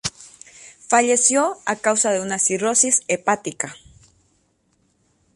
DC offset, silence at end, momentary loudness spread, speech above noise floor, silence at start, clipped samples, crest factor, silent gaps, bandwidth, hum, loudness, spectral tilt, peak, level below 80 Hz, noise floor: under 0.1%; 1.6 s; 12 LU; 45 dB; 0.05 s; under 0.1%; 20 dB; none; 11.5 kHz; none; -19 LUFS; -2 dB/octave; -2 dBFS; -60 dBFS; -65 dBFS